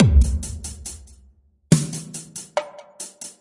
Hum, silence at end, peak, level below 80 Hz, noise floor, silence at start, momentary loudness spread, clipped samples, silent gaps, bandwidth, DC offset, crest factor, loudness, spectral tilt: none; 0.1 s; -2 dBFS; -26 dBFS; -55 dBFS; 0 s; 17 LU; under 0.1%; none; 11.5 kHz; under 0.1%; 20 dB; -24 LUFS; -6 dB/octave